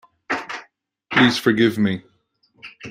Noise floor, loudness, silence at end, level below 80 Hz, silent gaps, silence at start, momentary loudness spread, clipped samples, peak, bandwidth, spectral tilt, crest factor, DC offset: -64 dBFS; -19 LUFS; 0 s; -60 dBFS; none; 0.3 s; 17 LU; under 0.1%; -2 dBFS; 16 kHz; -5 dB/octave; 20 dB; under 0.1%